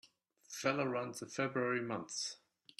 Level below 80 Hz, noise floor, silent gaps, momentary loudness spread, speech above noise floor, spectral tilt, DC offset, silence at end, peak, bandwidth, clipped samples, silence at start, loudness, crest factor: -84 dBFS; -63 dBFS; none; 8 LU; 25 dB; -4 dB/octave; under 0.1%; 0.45 s; -18 dBFS; 14 kHz; under 0.1%; 0.05 s; -38 LUFS; 22 dB